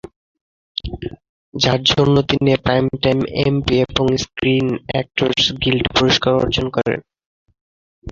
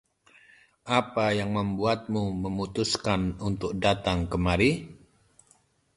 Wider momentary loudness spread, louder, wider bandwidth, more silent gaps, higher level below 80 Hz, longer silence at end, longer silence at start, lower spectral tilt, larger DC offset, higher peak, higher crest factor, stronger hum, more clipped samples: first, 13 LU vs 7 LU; first, -17 LUFS vs -27 LUFS; second, 7.6 kHz vs 11.5 kHz; first, 1.29-1.52 s, 7.26-7.46 s, 7.61-8.02 s vs none; first, -38 dBFS vs -44 dBFS; second, 0 s vs 1 s; about the same, 0.85 s vs 0.85 s; about the same, -5.5 dB/octave vs -5.5 dB/octave; neither; first, -2 dBFS vs -8 dBFS; about the same, 16 dB vs 20 dB; neither; neither